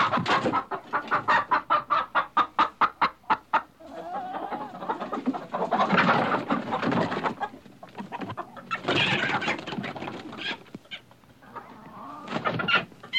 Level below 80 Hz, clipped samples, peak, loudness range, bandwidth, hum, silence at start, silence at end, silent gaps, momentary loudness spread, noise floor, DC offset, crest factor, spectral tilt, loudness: -66 dBFS; under 0.1%; -10 dBFS; 6 LU; 15.5 kHz; none; 0 s; 0 s; none; 18 LU; -53 dBFS; under 0.1%; 18 dB; -5 dB/octave; -27 LUFS